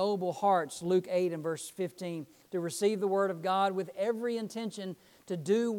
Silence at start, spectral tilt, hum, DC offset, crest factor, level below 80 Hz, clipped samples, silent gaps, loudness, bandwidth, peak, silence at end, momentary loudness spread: 0 s; -5.5 dB/octave; none; under 0.1%; 16 dB; -82 dBFS; under 0.1%; none; -32 LUFS; 18 kHz; -16 dBFS; 0 s; 11 LU